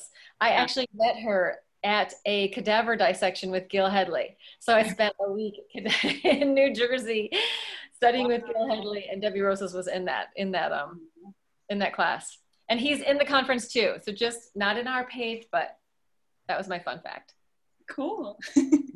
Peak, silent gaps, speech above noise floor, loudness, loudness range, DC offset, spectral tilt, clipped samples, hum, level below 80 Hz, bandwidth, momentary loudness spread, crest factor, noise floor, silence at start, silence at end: -8 dBFS; none; 54 dB; -27 LUFS; 6 LU; under 0.1%; -4 dB/octave; under 0.1%; none; -68 dBFS; 12.5 kHz; 12 LU; 20 dB; -81 dBFS; 0 s; 0 s